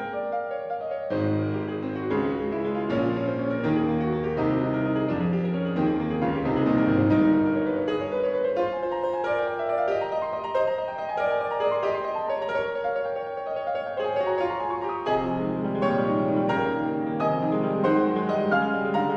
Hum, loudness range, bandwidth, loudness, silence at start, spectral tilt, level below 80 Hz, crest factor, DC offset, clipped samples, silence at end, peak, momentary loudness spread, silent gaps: none; 4 LU; 6.6 kHz; -26 LUFS; 0 s; -9 dB/octave; -54 dBFS; 14 dB; under 0.1%; under 0.1%; 0 s; -10 dBFS; 7 LU; none